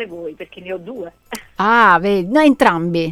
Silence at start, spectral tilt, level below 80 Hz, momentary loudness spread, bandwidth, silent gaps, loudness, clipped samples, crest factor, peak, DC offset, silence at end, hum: 0 s; -6 dB/octave; -48 dBFS; 20 LU; 15.5 kHz; none; -13 LUFS; under 0.1%; 16 dB; 0 dBFS; under 0.1%; 0 s; none